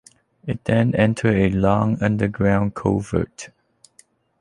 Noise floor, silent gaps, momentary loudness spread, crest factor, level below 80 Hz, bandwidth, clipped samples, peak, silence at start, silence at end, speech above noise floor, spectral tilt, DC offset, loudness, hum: -56 dBFS; none; 13 LU; 18 dB; -42 dBFS; 11.5 kHz; under 0.1%; -2 dBFS; 0.45 s; 0.95 s; 37 dB; -7.5 dB/octave; under 0.1%; -20 LUFS; none